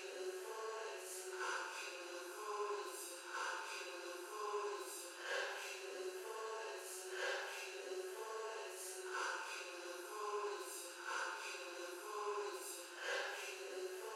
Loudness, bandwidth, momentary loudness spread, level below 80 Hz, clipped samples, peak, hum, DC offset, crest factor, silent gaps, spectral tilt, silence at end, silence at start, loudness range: -46 LUFS; 16 kHz; 5 LU; under -90 dBFS; under 0.1%; -30 dBFS; none; under 0.1%; 18 dB; none; 2 dB/octave; 0 s; 0 s; 1 LU